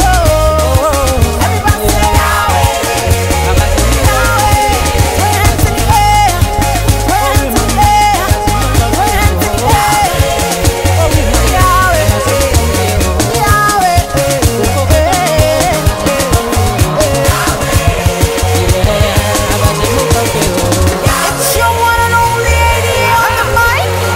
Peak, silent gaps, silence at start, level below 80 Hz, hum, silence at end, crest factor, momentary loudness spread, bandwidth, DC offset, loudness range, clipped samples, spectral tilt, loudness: 0 dBFS; none; 0 s; -16 dBFS; none; 0 s; 10 dB; 3 LU; 16.5 kHz; under 0.1%; 1 LU; under 0.1%; -4 dB/octave; -10 LUFS